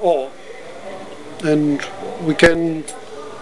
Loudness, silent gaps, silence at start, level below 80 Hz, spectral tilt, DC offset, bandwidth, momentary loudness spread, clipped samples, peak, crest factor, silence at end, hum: -18 LUFS; none; 0 s; -44 dBFS; -5.5 dB/octave; 1%; 12 kHz; 20 LU; under 0.1%; 0 dBFS; 18 dB; 0 s; none